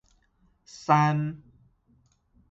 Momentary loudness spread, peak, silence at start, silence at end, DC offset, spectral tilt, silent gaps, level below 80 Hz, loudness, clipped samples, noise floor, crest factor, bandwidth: 25 LU; -8 dBFS; 0.75 s; 1.15 s; under 0.1%; -7 dB/octave; none; -64 dBFS; -25 LUFS; under 0.1%; -66 dBFS; 22 dB; 7.8 kHz